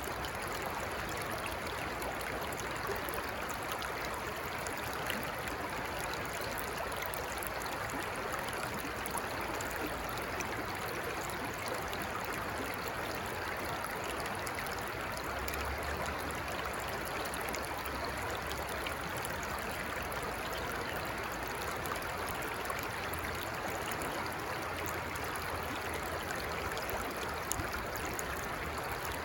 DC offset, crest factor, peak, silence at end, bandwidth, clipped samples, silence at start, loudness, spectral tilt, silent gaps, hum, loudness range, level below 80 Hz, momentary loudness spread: under 0.1%; 24 dB; -14 dBFS; 0 s; 19.5 kHz; under 0.1%; 0 s; -37 LUFS; -3.5 dB/octave; none; none; 0 LU; -52 dBFS; 1 LU